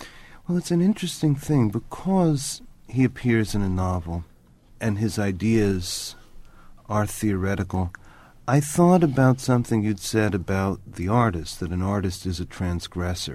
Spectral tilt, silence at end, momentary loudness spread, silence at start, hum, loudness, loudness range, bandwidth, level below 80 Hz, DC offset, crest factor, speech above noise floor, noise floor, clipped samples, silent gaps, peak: -6 dB/octave; 0 s; 11 LU; 0 s; none; -24 LUFS; 5 LU; 15.5 kHz; -42 dBFS; under 0.1%; 18 dB; 29 dB; -52 dBFS; under 0.1%; none; -4 dBFS